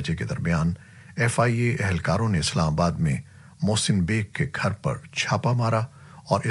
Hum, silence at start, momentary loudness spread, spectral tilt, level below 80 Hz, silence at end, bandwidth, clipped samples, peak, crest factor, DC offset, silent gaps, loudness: none; 0 s; 7 LU; -5.5 dB/octave; -46 dBFS; 0 s; 11.5 kHz; under 0.1%; -6 dBFS; 18 dB; under 0.1%; none; -25 LUFS